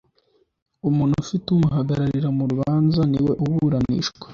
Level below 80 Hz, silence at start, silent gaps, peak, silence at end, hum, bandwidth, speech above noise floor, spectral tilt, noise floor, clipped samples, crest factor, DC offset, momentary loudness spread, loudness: -46 dBFS; 0.85 s; none; -8 dBFS; 0 s; none; 7.2 kHz; 44 dB; -7.5 dB/octave; -64 dBFS; under 0.1%; 12 dB; under 0.1%; 4 LU; -21 LUFS